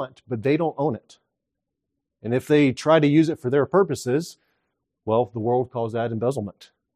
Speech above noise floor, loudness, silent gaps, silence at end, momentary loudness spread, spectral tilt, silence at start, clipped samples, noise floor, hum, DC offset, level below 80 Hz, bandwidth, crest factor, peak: 61 dB; -22 LUFS; none; 0.3 s; 13 LU; -7 dB/octave; 0 s; under 0.1%; -82 dBFS; none; under 0.1%; -64 dBFS; 14 kHz; 18 dB; -4 dBFS